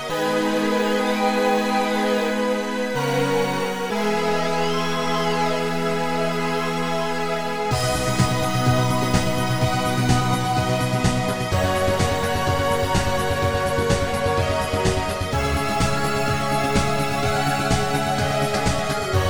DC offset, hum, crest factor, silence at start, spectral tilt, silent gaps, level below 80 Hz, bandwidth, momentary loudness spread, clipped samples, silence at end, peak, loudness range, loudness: 2%; none; 16 dB; 0 s; -5 dB/octave; none; -36 dBFS; over 20 kHz; 3 LU; under 0.1%; 0 s; -4 dBFS; 2 LU; -21 LUFS